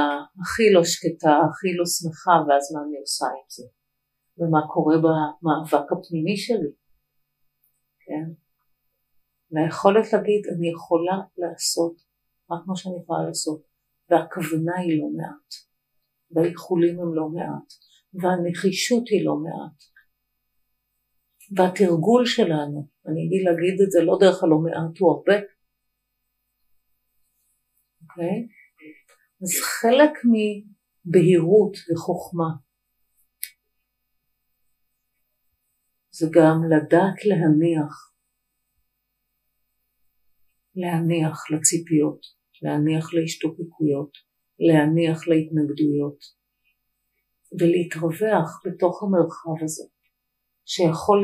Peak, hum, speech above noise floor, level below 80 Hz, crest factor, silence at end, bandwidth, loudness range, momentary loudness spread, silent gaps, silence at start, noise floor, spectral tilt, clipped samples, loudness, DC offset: 0 dBFS; none; 56 dB; -70 dBFS; 22 dB; 0 s; 15.5 kHz; 10 LU; 15 LU; none; 0 s; -77 dBFS; -5.5 dB/octave; under 0.1%; -22 LUFS; under 0.1%